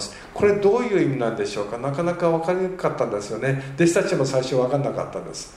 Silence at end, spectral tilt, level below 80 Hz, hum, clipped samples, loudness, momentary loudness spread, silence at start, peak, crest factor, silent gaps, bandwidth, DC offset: 0 s; -6 dB/octave; -54 dBFS; none; under 0.1%; -22 LUFS; 8 LU; 0 s; -6 dBFS; 16 dB; none; 12.5 kHz; under 0.1%